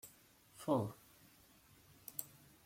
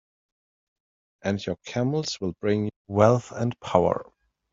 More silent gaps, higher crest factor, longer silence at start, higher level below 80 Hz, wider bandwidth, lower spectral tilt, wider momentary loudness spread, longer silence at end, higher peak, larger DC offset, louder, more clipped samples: second, none vs 2.76-2.85 s; about the same, 26 dB vs 24 dB; second, 0.05 s vs 1.25 s; second, -78 dBFS vs -60 dBFS; first, 16.5 kHz vs 7.8 kHz; about the same, -6 dB/octave vs -6.5 dB/octave; first, 27 LU vs 10 LU; second, 0.35 s vs 0.5 s; second, -20 dBFS vs -2 dBFS; neither; second, -42 LUFS vs -25 LUFS; neither